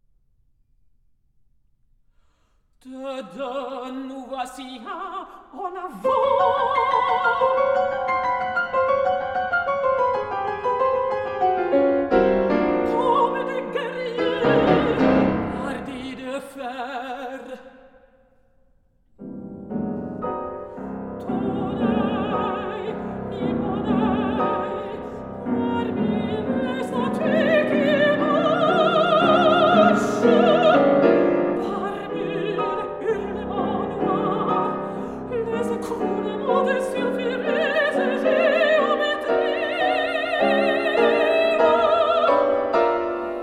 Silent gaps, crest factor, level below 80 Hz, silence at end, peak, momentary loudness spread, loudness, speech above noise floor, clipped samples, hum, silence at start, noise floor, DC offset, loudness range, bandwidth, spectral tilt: none; 18 dB; -50 dBFS; 0 s; -4 dBFS; 14 LU; -21 LUFS; 39 dB; under 0.1%; none; 2.85 s; -62 dBFS; under 0.1%; 15 LU; 12.5 kHz; -6.5 dB/octave